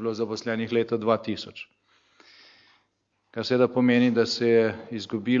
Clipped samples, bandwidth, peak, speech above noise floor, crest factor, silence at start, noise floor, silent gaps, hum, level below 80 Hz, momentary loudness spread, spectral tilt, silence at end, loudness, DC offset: under 0.1%; 7.6 kHz; -8 dBFS; 49 dB; 18 dB; 0 s; -74 dBFS; none; none; -72 dBFS; 15 LU; -6 dB/octave; 0 s; -25 LUFS; under 0.1%